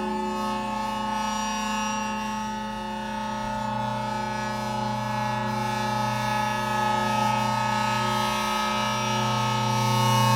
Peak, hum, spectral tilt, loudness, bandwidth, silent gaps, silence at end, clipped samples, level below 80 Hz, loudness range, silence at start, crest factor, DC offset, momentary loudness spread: -10 dBFS; 60 Hz at -55 dBFS; -4.5 dB/octave; -26 LUFS; 17.5 kHz; none; 0 s; under 0.1%; -50 dBFS; 5 LU; 0 s; 16 dB; under 0.1%; 6 LU